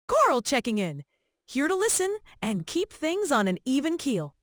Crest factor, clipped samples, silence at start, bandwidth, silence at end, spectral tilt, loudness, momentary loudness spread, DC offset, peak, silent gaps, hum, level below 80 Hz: 16 dB; under 0.1%; 0.1 s; over 20 kHz; 0.15 s; -4 dB/octave; -26 LUFS; 9 LU; under 0.1%; -10 dBFS; none; none; -60 dBFS